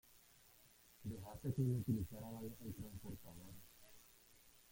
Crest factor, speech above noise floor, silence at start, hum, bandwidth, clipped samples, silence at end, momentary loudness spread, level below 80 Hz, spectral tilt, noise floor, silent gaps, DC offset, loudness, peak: 20 dB; 24 dB; 0.05 s; none; 16.5 kHz; under 0.1%; 0 s; 25 LU; -66 dBFS; -7.5 dB/octave; -68 dBFS; none; under 0.1%; -46 LUFS; -28 dBFS